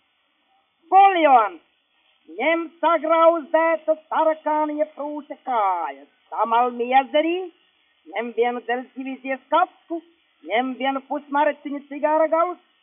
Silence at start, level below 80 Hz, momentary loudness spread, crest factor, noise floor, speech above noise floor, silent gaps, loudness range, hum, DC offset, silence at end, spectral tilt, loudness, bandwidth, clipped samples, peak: 0.9 s; -88 dBFS; 16 LU; 18 dB; -67 dBFS; 46 dB; none; 6 LU; none; under 0.1%; 0.25 s; 0.5 dB/octave; -21 LUFS; 3.7 kHz; under 0.1%; -4 dBFS